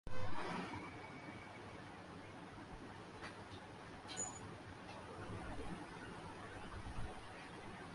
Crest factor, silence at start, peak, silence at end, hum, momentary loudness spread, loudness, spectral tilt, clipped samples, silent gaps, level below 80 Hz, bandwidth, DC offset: 18 dB; 0.05 s; -28 dBFS; 0 s; none; 8 LU; -50 LUFS; -4 dB/octave; under 0.1%; none; -60 dBFS; 11.5 kHz; under 0.1%